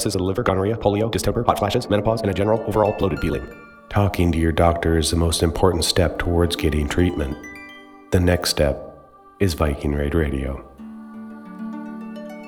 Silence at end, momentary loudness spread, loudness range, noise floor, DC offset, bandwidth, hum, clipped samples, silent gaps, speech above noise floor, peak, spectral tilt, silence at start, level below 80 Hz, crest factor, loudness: 0 s; 17 LU; 5 LU; -46 dBFS; under 0.1%; 17.5 kHz; none; under 0.1%; none; 26 dB; 0 dBFS; -5.5 dB/octave; 0 s; -32 dBFS; 20 dB; -21 LUFS